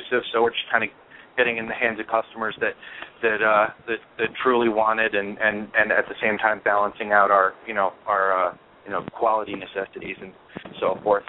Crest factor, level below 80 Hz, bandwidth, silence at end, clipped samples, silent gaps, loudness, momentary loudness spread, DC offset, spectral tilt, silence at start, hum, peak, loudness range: 20 dB; -62 dBFS; 4.1 kHz; 0.05 s; under 0.1%; none; -23 LUFS; 12 LU; under 0.1%; -8 dB/octave; 0 s; none; -2 dBFS; 4 LU